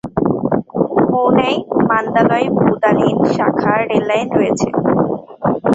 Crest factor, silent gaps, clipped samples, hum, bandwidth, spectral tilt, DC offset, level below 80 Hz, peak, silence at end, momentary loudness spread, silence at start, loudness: 14 dB; none; under 0.1%; none; 8 kHz; -7 dB/octave; under 0.1%; -46 dBFS; 0 dBFS; 0 s; 5 LU; 0.05 s; -15 LUFS